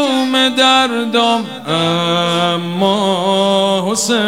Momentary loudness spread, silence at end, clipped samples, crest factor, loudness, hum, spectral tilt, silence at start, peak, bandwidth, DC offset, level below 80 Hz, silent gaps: 6 LU; 0 s; under 0.1%; 12 dB; -13 LUFS; none; -3.5 dB/octave; 0 s; -2 dBFS; 16.5 kHz; 0.3%; -68 dBFS; none